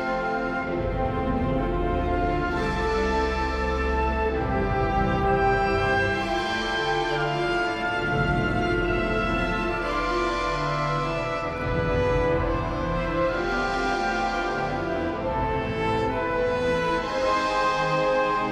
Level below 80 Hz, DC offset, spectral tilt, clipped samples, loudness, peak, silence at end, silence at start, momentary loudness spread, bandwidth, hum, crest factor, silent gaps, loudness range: -34 dBFS; under 0.1%; -6 dB/octave; under 0.1%; -25 LUFS; -10 dBFS; 0 s; 0 s; 4 LU; 12 kHz; none; 14 dB; none; 2 LU